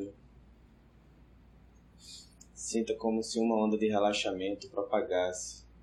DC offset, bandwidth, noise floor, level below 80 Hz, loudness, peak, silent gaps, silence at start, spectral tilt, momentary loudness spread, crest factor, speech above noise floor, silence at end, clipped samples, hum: under 0.1%; 12 kHz; -60 dBFS; -62 dBFS; -32 LUFS; -16 dBFS; none; 0 s; -4 dB/octave; 20 LU; 18 dB; 28 dB; 0.15 s; under 0.1%; none